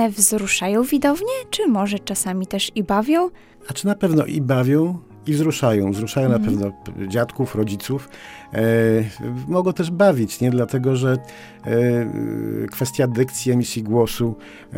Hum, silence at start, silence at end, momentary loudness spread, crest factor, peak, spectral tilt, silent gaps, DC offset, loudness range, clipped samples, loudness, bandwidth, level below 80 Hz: none; 0 s; 0 s; 10 LU; 20 dB; 0 dBFS; -5.5 dB/octave; none; under 0.1%; 2 LU; under 0.1%; -20 LUFS; 17.5 kHz; -50 dBFS